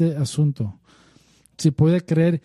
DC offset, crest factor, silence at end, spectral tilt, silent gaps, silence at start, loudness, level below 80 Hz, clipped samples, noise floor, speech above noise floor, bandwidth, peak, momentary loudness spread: under 0.1%; 16 dB; 0.05 s; -7.5 dB/octave; none; 0 s; -21 LUFS; -54 dBFS; under 0.1%; -56 dBFS; 37 dB; 12 kHz; -4 dBFS; 9 LU